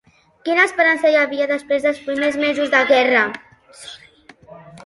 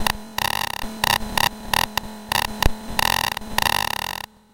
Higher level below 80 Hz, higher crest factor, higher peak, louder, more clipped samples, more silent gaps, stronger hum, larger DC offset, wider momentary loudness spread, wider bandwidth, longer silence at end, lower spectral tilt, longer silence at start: second, -62 dBFS vs -34 dBFS; second, 18 dB vs 24 dB; about the same, -2 dBFS vs 0 dBFS; first, -16 LUFS vs -22 LUFS; neither; neither; neither; neither; first, 22 LU vs 7 LU; second, 11.5 kHz vs 17.5 kHz; second, 0.05 s vs 0.35 s; about the same, -3 dB/octave vs -2 dB/octave; first, 0.45 s vs 0 s